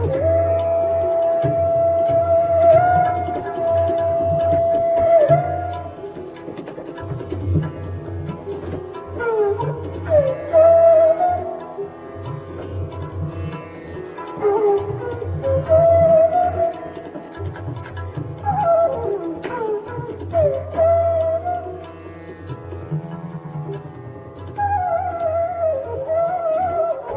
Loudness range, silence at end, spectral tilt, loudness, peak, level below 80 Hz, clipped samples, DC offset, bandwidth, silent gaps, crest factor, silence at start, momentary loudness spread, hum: 10 LU; 0 s; -11.5 dB/octave; -19 LUFS; -4 dBFS; -38 dBFS; under 0.1%; under 0.1%; 3.9 kHz; none; 16 dB; 0 s; 18 LU; none